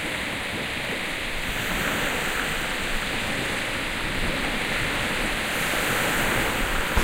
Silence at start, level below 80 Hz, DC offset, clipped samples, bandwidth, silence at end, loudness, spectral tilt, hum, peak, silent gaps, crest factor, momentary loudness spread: 0 s; -36 dBFS; under 0.1%; under 0.1%; 16 kHz; 0 s; -25 LUFS; -3 dB/octave; none; -6 dBFS; none; 20 dB; 5 LU